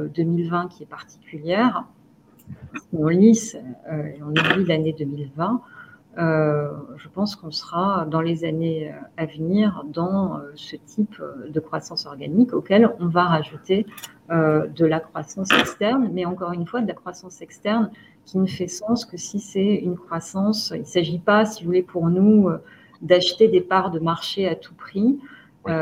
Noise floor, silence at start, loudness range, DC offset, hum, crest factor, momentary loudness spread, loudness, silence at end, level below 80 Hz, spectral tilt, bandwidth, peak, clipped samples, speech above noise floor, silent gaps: -53 dBFS; 0 s; 6 LU; under 0.1%; none; 22 dB; 16 LU; -22 LUFS; 0 s; -60 dBFS; -6 dB/octave; 15.5 kHz; 0 dBFS; under 0.1%; 31 dB; none